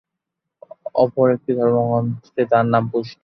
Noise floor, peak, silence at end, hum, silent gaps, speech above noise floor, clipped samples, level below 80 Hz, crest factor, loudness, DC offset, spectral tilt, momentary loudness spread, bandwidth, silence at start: -81 dBFS; -2 dBFS; 0.1 s; none; none; 63 dB; under 0.1%; -60 dBFS; 18 dB; -19 LUFS; under 0.1%; -9.5 dB/octave; 9 LU; 6.2 kHz; 0.85 s